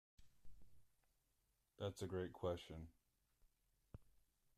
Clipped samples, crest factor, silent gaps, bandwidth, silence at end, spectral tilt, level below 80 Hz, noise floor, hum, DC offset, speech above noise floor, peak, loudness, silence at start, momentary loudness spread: under 0.1%; 20 dB; none; 14 kHz; 0.5 s; -6 dB/octave; -72 dBFS; -85 dBFS; none; under 0.1%; 37 dB; -34 dBFS; -49 LUFS; 0.2 s; 19 LU